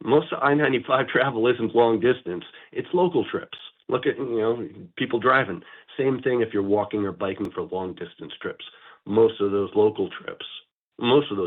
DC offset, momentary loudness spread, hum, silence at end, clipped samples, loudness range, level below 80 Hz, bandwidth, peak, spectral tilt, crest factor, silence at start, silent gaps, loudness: under 0.1%; 17 LU; none; 0 s; under 0.1%; 4 LU; -66 dBFS; 4.2 kHz; -8 dBFS; -9 dB/octave; 16 dB; 0 s; 10.72-10.92 s; -23 LUFS